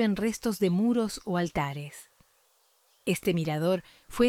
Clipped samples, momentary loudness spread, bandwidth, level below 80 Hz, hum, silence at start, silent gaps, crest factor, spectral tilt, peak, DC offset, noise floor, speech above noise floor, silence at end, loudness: under 0.1%; 14 LU; 17 kHz; -56 dBFS; none; 0 s; none; 16 dB; -6 dB/octave; -12 dBFS; under 0.1%; -67 dBFS; 39 dB; 0 s; -29 LUFS